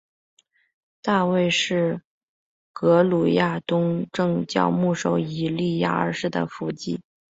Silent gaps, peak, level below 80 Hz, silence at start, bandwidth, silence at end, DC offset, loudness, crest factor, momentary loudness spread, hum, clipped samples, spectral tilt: 2.05-2.74 s; -4 dBFS; -62 dBFS; 1.05 s; 8 kHz; 0.4 s; under 0.1%; -23 LUFS; 20 dB; 11 LU; none; under 0.1%; -6 dB/octave